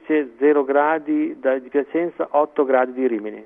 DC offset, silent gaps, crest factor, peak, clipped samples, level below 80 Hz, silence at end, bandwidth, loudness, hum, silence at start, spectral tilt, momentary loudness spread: under 0.1%; none; 16 dB; -4 dBFS; under 0.1%; -70 dBFS; 0 s; 3.7 kHz; -20 LUFS; none; 0.1 s; -9 dB/octave; 5 LU